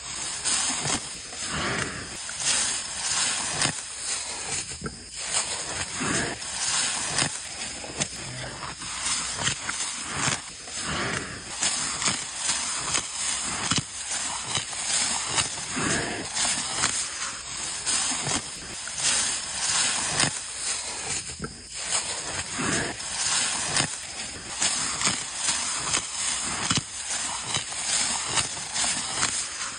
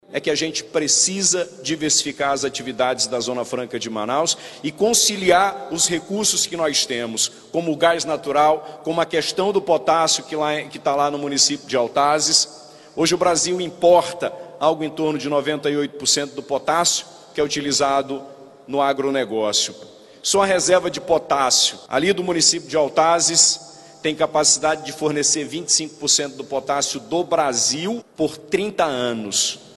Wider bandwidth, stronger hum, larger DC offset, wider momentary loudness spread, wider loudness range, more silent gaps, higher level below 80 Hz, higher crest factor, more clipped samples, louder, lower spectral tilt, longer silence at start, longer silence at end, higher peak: second, 11.5 kHz vs 13 kHz; neither; neither; about the same, 9 LU vs 10 LU; about the same, 2 LU vs 4 LU; neither; first, -52 dBFS vs -58 dBFS; about the same, 24 dB vs 20 dB; neither; second, -26 LUFS vs -19 LUFS; second, -0.5 dB/octave vs -2 dB/octave; about the same, 0 s vs 0.1 s; second, 0 s vs 0.15 s; second, -4 dBFS vs 0 dBFS